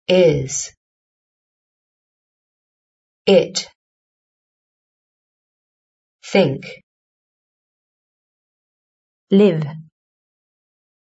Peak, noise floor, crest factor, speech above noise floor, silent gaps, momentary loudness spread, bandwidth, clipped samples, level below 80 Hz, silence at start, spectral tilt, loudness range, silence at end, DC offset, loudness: -2 dBFS; under -90 dBFS; 22 dB; over 74 dB; 0.77-3.25 s, 3.75-6.19 s, 6.83-9.27 s; 18 LU; 8 kHz; under 0.1%; -56 dBFS; 0.1 s; -5 dB/octave; 3 LU; 1.25 s; under 0.1%; -17 LUFS